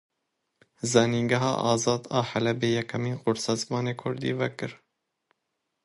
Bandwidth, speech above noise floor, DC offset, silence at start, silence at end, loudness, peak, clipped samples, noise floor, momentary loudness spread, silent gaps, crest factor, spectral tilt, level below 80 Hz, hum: 11.5 kHz; 54 dB; under 0.1%; 0.85 s; 1.1 s; -27 LUFS; -6 dBFS; under 0.1%; -81 dBFS; 8 LU; none; 22 dB; -5 dB/octave; -64 dBFS; none